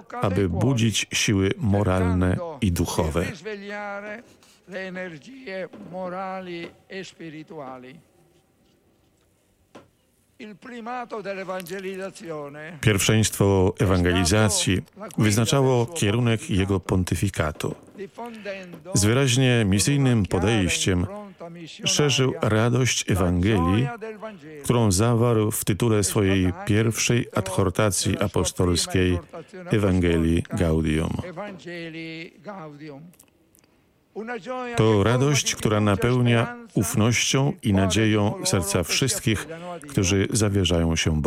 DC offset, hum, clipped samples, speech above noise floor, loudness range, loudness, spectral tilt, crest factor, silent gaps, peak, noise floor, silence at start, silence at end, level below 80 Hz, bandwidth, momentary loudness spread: under 0.1%; none; under 0.1%; 41 dB; 14 LU; -22 LUFS; -5 dB/octave; 18 dB; none; -6 dBFS; -64 dBFS; 0.1 s; 0 s; -44 dBFS; 16 kHz; 17 LU